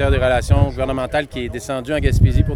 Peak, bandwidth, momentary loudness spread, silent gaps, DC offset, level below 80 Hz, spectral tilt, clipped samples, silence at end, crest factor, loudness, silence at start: -2 dBFS; 13.5 kHz; 10 LU; none; under 0.1%; -22 dBFS; -6.5 dB/octave; under 0.1%; 0 s; 16 dB; -18 LUFS; 0 s